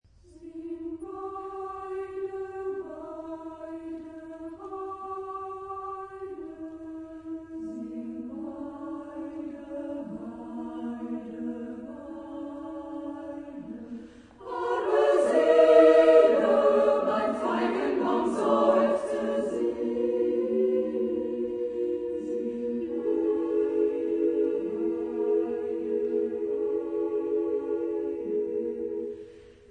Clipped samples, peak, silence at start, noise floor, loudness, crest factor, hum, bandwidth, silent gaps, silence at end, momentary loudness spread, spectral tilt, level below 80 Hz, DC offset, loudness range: under 0.1%; -6 dBFS; 0.35 s; -49 dBFS; -27 LUFS; 22 dB; none; 10 kHz; none; 0.15 s; 18 LU; -6 dB/octave; -64 dBFS; under 0.1%; 17 LU